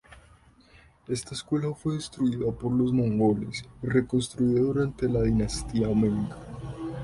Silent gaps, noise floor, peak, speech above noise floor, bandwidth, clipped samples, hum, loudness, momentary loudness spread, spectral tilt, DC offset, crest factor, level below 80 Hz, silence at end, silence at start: none; -56 dBFS; -10 dBFS; 30 dB; 11.5 kHz; under 0.1%; none; -27 LUFS; 11 LU; -6.5 dB/octave; under 0.1%; 16 dB; -44 dBFS; 0 s; 0.1 s